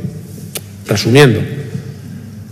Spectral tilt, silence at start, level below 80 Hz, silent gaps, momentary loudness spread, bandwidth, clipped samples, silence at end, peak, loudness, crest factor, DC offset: -5.5 dB/octave; 0 s; -46 dBFS; none; 22 LU; 16 kHz; 0.5%; 0 s; 0 dBFS; -12 LUFS; 14 dB; under 0.1%